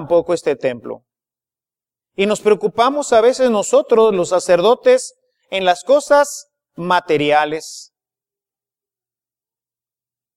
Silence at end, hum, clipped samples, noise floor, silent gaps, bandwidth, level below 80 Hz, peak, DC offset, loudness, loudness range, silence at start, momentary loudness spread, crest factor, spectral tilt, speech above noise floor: 2.55 s; none; under 0.1%; under -90 dBFS; none; 13.5 kHz; -60 dBFS; 0 dBFS; under 0.1%; -15 LUFS; 7 LU; 0 s; 18 LU; 16 dB; -4 dB/octave; over 75 dB